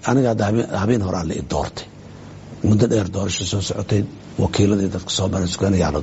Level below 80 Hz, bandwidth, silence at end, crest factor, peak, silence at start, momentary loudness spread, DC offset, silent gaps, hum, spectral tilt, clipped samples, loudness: -40 dBFS; 8.2 kHz; 0 s; 16 dB; -2 dBFS; 0 s; 14 LU; under 0.1%; none; none; -5.5 dB/octave; under 0.1%; -20 LUFS